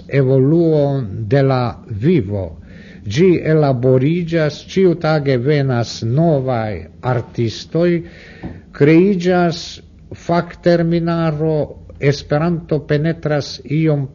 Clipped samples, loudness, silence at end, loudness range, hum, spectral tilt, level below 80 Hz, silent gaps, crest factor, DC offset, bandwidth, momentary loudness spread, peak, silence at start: under 0.1%; -16 LUFS; 0.05 s; 3 LU; none; -7.5 dB/octave; -44 dBFS; none; 16 dB; under 0.1%; 7.4 kHz; 12 LU; 0 dBFS; 0 s